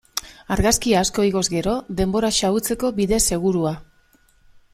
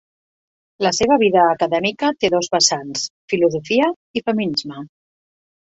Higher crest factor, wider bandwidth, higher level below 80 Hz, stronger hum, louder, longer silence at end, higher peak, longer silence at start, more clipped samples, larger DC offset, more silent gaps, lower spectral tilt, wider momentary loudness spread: about the same, 18 dB vs 18 dB; first, 16 kHz vs 8.2 kHz; first, -36 dBFS vs -56 dBFS; neither; about the same, -20 LUFS vs -18 LUFS; about the same, 0.9 s vs 0.8 s; about the same, -4 dBFS vs -2 dBFS; second, 0.15 s vs 0.8 s; neither; neither; second, none vs 3.10-3.28 s, 3.96-4.14 s; about the same, -4 dB/octave vs -3 dB/octave; about the same, 9 LU vs 10 LU